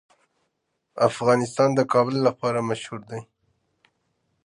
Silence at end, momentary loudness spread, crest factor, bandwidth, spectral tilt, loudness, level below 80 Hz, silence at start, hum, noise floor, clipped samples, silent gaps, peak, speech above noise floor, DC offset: 1.2 s; 17 LU; 20 dB; 11.5 kHz; -6 dB/octave; -22 LUFS; -68 dBFS; 0.95 s; none; -76 dBFS; under 0.1%; none; -4 dBFS; 53 dB; under 0.1%